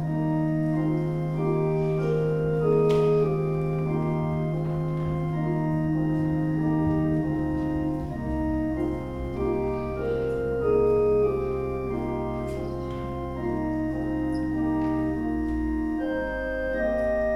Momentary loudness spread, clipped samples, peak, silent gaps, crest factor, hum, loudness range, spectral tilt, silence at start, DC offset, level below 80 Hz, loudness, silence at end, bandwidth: 7 LU; under 0.1%; -12 dBFS; none; 14 dB; none; 4 LU; -9.5 dB/octave; 0 s; under 0.1%; -40 dBFS; -26 LUFS; 0 s; 10.5 kHz